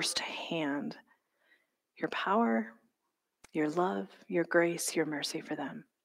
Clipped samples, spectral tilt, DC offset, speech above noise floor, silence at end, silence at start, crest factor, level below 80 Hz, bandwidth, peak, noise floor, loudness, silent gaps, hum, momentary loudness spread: under 0.1%; -3.5 dB/octave; under 0.1%; 51 dB; 0.25 s; 0 s; 20 dB; -82 dBFS; 16 kHz; -14 dBFS; -84 dBFS; -33 LUFS; none; none; 11 LU